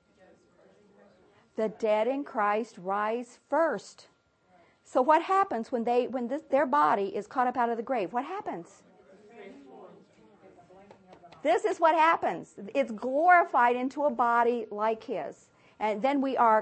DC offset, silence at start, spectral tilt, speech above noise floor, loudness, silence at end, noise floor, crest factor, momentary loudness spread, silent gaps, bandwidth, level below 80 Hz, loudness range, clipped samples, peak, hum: under 0.1%; 1.6 s; -5 dB/octave; 38 dB; -27 LUFS; 0 s; -65 dBFS; 20 dB; 13 LU; none; 8.8 kHz; -78 dBFS; 9 LU; under 0.1%; -8 dBFS; none